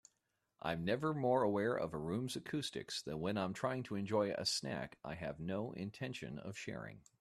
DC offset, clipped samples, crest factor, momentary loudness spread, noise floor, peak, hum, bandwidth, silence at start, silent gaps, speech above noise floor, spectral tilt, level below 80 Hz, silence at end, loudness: under 0.1%; under 0.1%; 18 dB; 11 LU; -85 dBFS; -22 dBFS; none; 14 kHz; 0.65 s; none; 45 dB; -5 dB/octave; -70 dBFS; 0.2 s; -40 LUFS